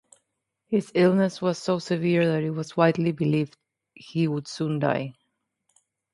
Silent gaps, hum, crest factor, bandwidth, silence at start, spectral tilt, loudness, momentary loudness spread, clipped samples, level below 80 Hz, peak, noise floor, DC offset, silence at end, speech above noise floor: none; none; 20 dB; 11.5 kHz; 0.7 s; -7 dB/octave; -25 LUFS; 8 LU; under 0.1%; -68 dBFS; -6 dBFS; -79 dBFS; under 0.1%; 1.05 s; 55 dB